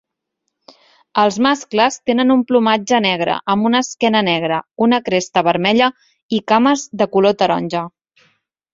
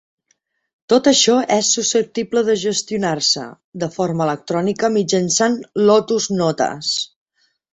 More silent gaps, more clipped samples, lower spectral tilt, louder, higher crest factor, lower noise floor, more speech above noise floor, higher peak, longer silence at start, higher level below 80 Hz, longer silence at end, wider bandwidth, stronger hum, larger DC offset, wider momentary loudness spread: about the same, 6.23-6.29 s vs 3.64-3.72 s; neither; about the same, -4.5 dB/octave vs -3.5 dB/octave; about the same, -16 LUFS vs -17 LUFS; about the same, 16 dB vs 16 dB; first, -75 dBFS vs -66 dBFS; first, 60 dB vs 49 dB; about the same, 0 dBFS vs -2 dBFS; first, 1.15 s vs 0.9 s; about the same, -60 dBFS vs -60 dBFS; first, 0.85 s vs 0.65 s; about the same, 7.8 kHz vs 8.4 kHz; neither; neither; about the same, 6 LU vs 7 LU